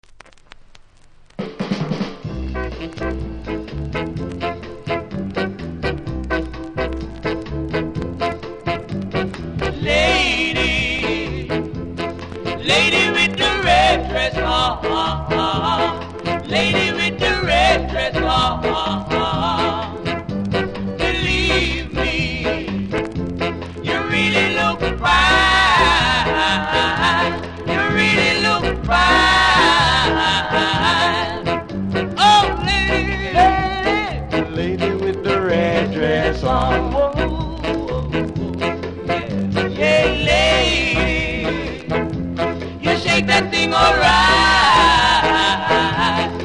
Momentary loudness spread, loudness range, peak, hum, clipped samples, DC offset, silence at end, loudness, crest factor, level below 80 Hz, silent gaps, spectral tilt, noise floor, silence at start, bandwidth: 13 LU; 11 LU; 0 dBFS; none; under 0.1%; under 0.1%; 0 s; -17 LUFS; 18 dB; -30 dBFS; none; -4.5 dB/octave; -46 dBFS; 0.75 s; 10.5 kHz